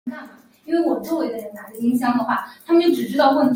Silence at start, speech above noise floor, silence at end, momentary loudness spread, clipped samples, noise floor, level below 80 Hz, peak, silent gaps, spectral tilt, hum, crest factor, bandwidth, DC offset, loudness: 0.05 s; 23 dB; 0 s; 15 LU; under 0.1%; -42 dBFS; -66 dBFS; -2 dBFS; none; -5.5 dB/octave; none; 18 dB; 16.5 kHz; under 0.1%; -20 LUFS